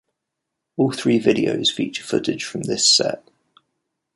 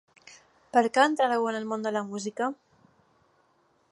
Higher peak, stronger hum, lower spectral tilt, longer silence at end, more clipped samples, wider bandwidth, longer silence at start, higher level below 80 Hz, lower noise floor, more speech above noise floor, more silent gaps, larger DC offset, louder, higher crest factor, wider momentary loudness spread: first, -2 dBFS vs -8 dBFS; neither; about the same, -3 dB/octave vs -4 dB/octave; second, 1 s vs 1.35 s; neither; about the same, 11.5 kHz vs 11.5 kHz; first, 0.8 s vs 0.3 s; first, -60 dBFS vs -78 dBFS; first, -81 dBFS vs -67 dBFS; first, 61 dB vs 41 dB; neither; neither; first, -19 LUFS vs -27 LUFS; about the same, 20 dB vs 22 dB; about the same, 12 LU vs 10 LU